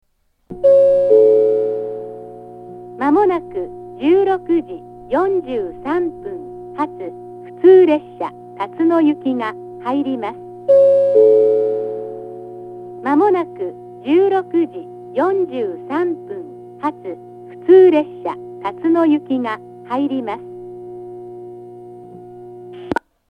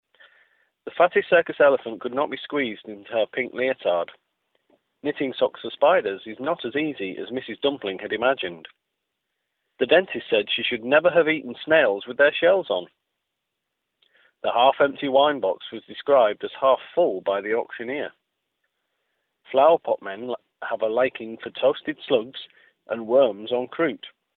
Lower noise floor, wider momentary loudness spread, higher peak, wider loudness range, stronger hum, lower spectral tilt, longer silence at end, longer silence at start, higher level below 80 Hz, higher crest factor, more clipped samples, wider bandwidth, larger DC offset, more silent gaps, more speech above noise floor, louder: second, -39 dBFS vs -81 dBFS; first, 23 LU vs 13 LU; first, 0 dBFS vs -4 dBFS; about the same, 6 LU vs 6 LU; first, 60 Hz at -45 dBFS vs none; about the same, -8 dB/octave vs -8 dB/octave; about the same, 0.35 s vs 0.3 s; second, 0.5 s vs 0.85 s; first, -56 dBFS vs -70 dBFS; about the same, 16 dB vs 20 dB; neither; first, 5 kHz vs 4.3 kHz; neither; neither; second, 24 dB vs 58 dB; first, -16 LUFS vs -23 LUFS